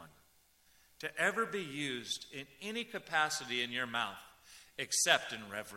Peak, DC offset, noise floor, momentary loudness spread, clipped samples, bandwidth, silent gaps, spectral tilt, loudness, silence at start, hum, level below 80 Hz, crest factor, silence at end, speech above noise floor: -12 dBFS; under 0.1%; -68 dBFS; 15 LU; under 0.1%; 16 kHz; none; -1 dB/octave; -35 LUFS; 0 s; none; -76 dBFS; 26 dB; 0 s; 32 dB